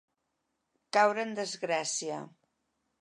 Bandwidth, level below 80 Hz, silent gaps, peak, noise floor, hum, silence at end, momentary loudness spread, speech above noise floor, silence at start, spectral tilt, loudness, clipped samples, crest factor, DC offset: 11.5 kHz; -88 dBFS; none; -12 dBFS; -82 dBFS; none; 0.75 s; 14 LU; 51 dB; 0.95 s; -2 dB/octave; -30 LUFS; under 0.1%; 22 dB; under 0.1%